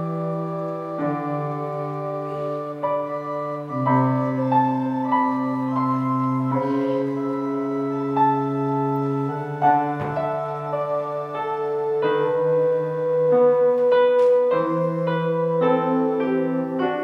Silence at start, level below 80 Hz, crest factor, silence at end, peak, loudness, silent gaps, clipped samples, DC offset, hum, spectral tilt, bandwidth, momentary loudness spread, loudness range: 0 s; -66 dBFS; 16 dB; 0 s; -6 dBFS; -22 LUFS; none; under 0.1%; under 0.1%; none; -9 dB/octave; 6.2 kHz; 10 LU; 6 LU